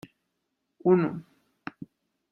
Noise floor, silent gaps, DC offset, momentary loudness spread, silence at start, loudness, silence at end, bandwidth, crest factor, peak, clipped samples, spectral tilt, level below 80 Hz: -80 dBFS; none; under 0.1%; 24 LU; 0.85 s; -25 LUFS; 1.1 s; 5.6 kHz; 22 dB; -10 dBFS; under 0.1%; -10 dB/octave; -70 dBFS